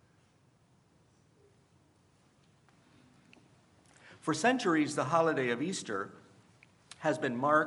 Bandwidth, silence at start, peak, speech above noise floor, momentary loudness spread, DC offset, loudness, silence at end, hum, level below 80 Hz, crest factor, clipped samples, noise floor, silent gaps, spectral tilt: 11.5 kHz; 4.05 s; -14 dBFS; 37 dB; 11 LU; under 0.1%; -32 LUFS; 0 s; none; -80 dBFS; 22 dB; under 0.1%; -67 dBFS; none; -4.5 dB/octave